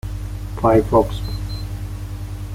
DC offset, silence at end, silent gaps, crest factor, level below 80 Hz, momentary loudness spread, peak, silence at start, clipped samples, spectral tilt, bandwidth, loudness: under 0.1%; 0 s; none; 18 dB; -30 dBFS; 15 LU; -2 dBFS; 0.05 s; under 0.1%; -7.5 dB/octave; 16 kHz; -21 LUFS